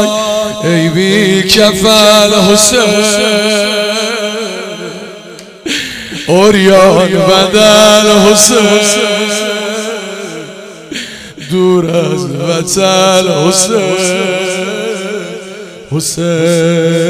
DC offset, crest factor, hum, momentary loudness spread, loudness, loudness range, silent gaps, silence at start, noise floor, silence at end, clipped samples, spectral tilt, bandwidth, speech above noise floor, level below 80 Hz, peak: under 0.1%; 10 dB; none; 17 LU; -8 LUFS; 8 LU; none; 0 s; -30 dBFS; 0 s; 1%; -3.5 dB/octave; over 20 kHz; 22 dB; -42 dBFS; 0 dBFS